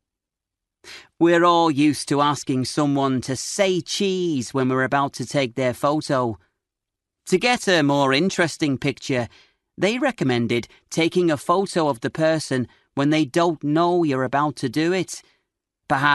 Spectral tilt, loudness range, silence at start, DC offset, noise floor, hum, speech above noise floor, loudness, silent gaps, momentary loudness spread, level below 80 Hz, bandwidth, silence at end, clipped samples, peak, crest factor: -5 dB/octave; 2 LU; 0.85 s; under 0.1%; -85 dBFS; none; 65 dB; -21 LUFS; none; 8 LU; -60 dBFS; 12 kHz; 0 s; under 0.1%; -2 dBFS; 18 dB